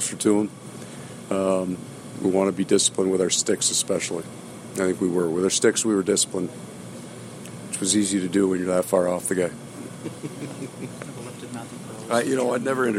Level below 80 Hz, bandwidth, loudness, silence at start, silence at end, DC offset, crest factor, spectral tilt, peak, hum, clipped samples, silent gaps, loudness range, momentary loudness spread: -68 dBFS; 16 kHz; -23 LUFS; 0 s; 0 s; under 0.1%; 18 dB; -3.5 dB/octave; -6 dBFS; none; under 0.1%; none; 6 LU; 18 LU